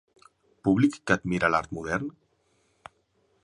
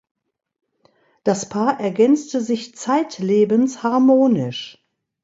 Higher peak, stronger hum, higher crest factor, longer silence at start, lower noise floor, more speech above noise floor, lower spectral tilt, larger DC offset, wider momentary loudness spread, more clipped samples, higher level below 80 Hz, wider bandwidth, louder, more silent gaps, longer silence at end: about the same, -6 dBFS vs -4 dBFS; neither; first, 24 dB vs 16 dB; second, 0.65 s vs 1.25 s; first, -69 dBFS vs -60 dBFS; about the same, 44 dB vs 42 dB; about the same, -6.5 dB/octave vs -6 dB/octave; neither; about the same, 8 LU vs 10 LU; neither; first, -54 dBFS vs -66 dBFS; first, 11 kHz vs 8 kHz; second, -26 LUFS vs -18 LUFS; neither; first, 1.35 s vs 0.55 s